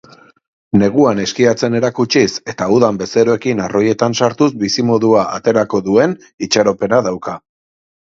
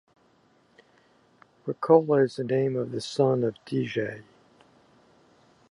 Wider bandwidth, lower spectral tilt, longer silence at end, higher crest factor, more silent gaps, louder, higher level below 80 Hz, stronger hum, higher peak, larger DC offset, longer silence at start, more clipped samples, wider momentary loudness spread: second, 7.8 kHz vs 11 kHz; second, -5 dB/octave vs -7 dB/octave; second, 0.8 s vs 1.5 s; second, 14 dB vs 22 dB; first, 6.34-6.38 s vs none; first, -14 LUFS vs -26 LUFS; first, -50 dBFS vs -72 dBFS; neither; first, 0 dBFS vs -6 dBFS; neither; second, 0.75 s vs 1.65 s; neither; second, 5 LU vs 15 LU